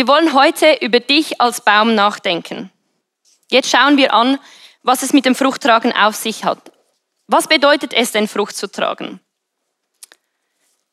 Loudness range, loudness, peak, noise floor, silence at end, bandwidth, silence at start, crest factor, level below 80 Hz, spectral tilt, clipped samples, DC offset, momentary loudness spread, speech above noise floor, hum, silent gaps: 4 LU; -14 LUFS; 0 dBFS; -73 dBFS; 1.75 s; 15 kHz; 0 s; 16 dB; -78 dBFS; -2.5 dB/octave; under 0.1%; under 0.1%; 11 LU; 59 dB; none; none